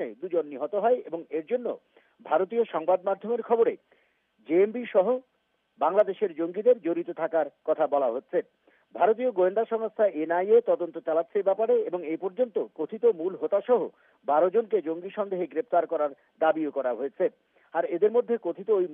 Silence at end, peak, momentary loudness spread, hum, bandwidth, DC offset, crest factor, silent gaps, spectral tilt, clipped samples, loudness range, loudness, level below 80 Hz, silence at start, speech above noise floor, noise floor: 0 s; -10 dBFS; 8 LU; none; 3.7 kHz; under 0.1%; 16 dB; none; -5 dB/octave; under 0.1%; 3 LU; -27 LUFS; under -90 dBFS; 0 s; 46 dB; -73 dBFS